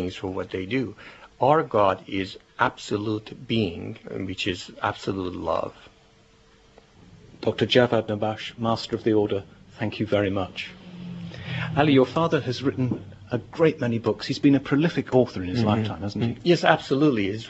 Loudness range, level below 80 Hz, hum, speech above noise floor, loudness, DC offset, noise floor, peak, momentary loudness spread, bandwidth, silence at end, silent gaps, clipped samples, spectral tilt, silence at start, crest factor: 6 LU; -56 dBFS; none; 32 dB; -24 LUFS; under 0.1%; -56 dBFS; -2 dBFS; 13 LU; 8.2 kHz; 0 s; none; under 0.1%; -6.5 dB/octave; 0 s; 24 dB